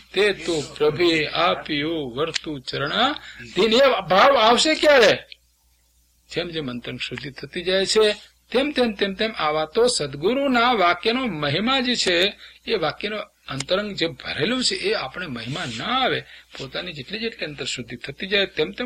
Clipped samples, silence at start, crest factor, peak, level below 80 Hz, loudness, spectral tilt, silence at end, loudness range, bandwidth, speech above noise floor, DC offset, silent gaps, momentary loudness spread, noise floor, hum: under 0.1%; 0.15 s; 18 dB; -4 dBFS; -52 dBFS; -21 LUFS; -3.5 dB/octave; 0 s; 7 LU; 16.5 kHz; 40 dB; under 0.1%; none; 14 LU; -62 dBFS; none